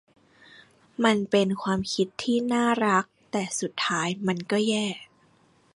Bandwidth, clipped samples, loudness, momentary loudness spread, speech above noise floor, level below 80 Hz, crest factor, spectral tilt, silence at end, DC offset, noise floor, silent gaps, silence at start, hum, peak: 11.5 kHz; under 0.1%; -25 LUFS; 8 LU; 36 dB; -64 dBFS; 18 dB; -4.5 dB/octave; 0.7 s; under 0.1%; -61 dBFS; none; 1 s; none; -8 dBFS